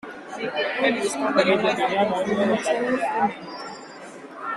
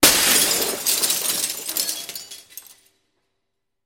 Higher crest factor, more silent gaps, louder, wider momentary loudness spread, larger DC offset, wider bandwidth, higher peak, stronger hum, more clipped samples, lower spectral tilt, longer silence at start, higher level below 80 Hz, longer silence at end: about the same, 18 dB vs 22 dB; neither; second, -23 LUFS vs -18 LUFS; second, 16 LU vs 21 LU; neither; second, 13 kHz vs 17 kHz; second, -6 dBFS vs 0 dBFS; neither; neither; first, -4 dB/octave vs 0 dB/octave; about the same, 0.05 s vs 0 s; second, -64 dBFS vs -54 dBFS; second, 0 s vs 1.25 s